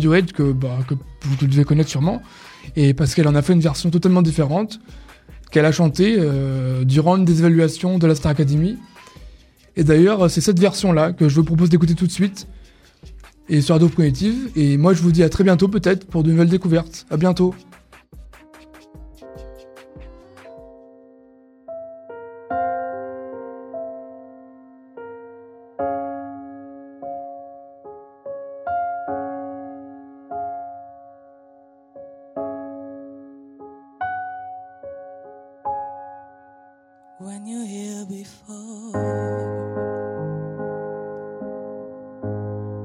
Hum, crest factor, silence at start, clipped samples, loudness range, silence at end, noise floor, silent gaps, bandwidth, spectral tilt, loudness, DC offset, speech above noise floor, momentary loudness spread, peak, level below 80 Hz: none; 18 dB; 0 s; under 0.1%; 18 LU; 0 s; -51 dBFS; none; 12.5 kHz; -7 dB/octave; -18 LUFS; under 0.1%; 35 dB; 23 LU; -2 dBFS; -44 dBFS